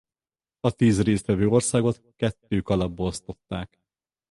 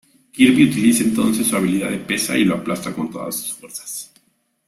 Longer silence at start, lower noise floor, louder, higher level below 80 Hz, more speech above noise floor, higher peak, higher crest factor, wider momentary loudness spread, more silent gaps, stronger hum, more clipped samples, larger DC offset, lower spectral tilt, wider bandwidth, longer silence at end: first, 0.65 s vs 0.35 s; first, under -90 dBFS vs -63 dBFS; second, -24 LUFS vs -18 LUFS; first, -46 dBFS vs -54 dBFS; first, over 66 dB vs 45 dB; second, -6 dBFS vs -2 dBFS; about the same, 20 dB vs 18 dB; about the same, 14 LU vs 15 LU; neither; neither; neither; neither; first, -6 dB/octave vs -4 dB/octave; second, 11.5 kHz vs 15.5 kHz; about the same, 0.65 s vs 0.65 s